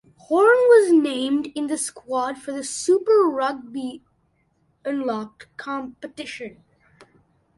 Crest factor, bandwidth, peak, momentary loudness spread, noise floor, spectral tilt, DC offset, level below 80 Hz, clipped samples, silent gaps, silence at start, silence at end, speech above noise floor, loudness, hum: 18 dB; 11.5 kHz; -4 dBFS; 20 LU; -66 dBFS; -3 dB/octave; under 0.1%; -68 dBFS; under 0.1%; none; 0.3 s; 1.1 s; 43 dB; -21 LUFS; none